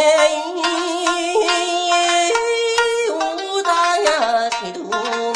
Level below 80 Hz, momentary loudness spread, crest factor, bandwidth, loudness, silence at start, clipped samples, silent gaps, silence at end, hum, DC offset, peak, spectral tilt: -58 dBFS; 6 LU; 16 dB; 11 kHz; -17 LUFS; 0 s; under 0.1%; none; 0 s; none; under 0.1%; -2 dBFS; -0.5 dB/octave